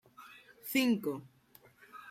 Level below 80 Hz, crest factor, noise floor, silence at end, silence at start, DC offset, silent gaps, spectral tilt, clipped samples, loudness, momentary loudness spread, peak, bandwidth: -82 dBFS; 18 dB; -62 dBFS; 0 s; 0.2 s; under 0.1%; none; -4 dB/octave; under 0.1%; -33 LUFS; 24 LU; -18 dBFS; 16 kHz